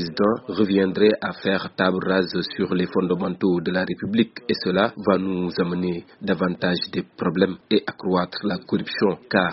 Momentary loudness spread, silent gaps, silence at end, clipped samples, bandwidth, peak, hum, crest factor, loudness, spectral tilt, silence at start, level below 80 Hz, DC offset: 6 LU; none; 0 s; under 0.1%; 6 kHz; -4 dBFS; none; 18 dB; -23 LUFS; -4.5 dB/octave; 0 s; -58 dBFS; under 0.1%